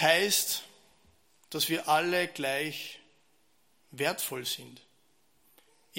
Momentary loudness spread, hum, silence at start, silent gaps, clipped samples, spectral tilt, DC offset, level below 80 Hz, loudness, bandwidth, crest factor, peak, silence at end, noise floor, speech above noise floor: 15 LU; none; 0 s; none; under 0.1%; -2 dB/octave; under 0.1%; -80 dBFS; -29 LUFS; 16.5 kHz; 26 dB; -8 dBFS; 0 s; -71 dBFS; 41 dB